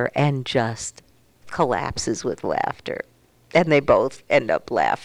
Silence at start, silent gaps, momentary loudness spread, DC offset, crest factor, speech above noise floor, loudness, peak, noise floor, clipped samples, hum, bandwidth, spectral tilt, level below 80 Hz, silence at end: 0 s; none; 14 LU; under 0.1%; 18 dB; 24 dB; -22 LUFS; -4 dBFS; -46 dBFS; under 0.1%; none; 12.5 kHz; -5 dB/octave; -50 dBFS; 0 s